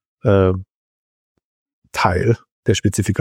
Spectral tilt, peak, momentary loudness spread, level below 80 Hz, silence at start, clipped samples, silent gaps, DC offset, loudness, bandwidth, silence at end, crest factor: -6 dB/octave; -2 dBFS; 7 LU; -44 dBFS; 0.25 s; under 0.1%; 0.74-1.35 s, 1.44-1.66 s, 1.73-1.82 s, 2.52-2.63 s; under 0.1%; -18 LUFS; 15.5 kHz; 0 s; 18 dB